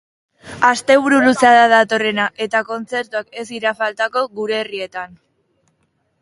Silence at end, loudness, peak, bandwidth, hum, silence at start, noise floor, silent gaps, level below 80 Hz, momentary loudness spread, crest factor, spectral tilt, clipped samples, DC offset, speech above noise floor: 1.15 s; -16 LUFS; 0 dBFS; 11.5 kHz; none; 0.45 s; -65 dBFS; none; -60 dBFS; 16 LU; 18 dB; -3.5 dB/octave; under 0.1%; under 0.1%; 49 dB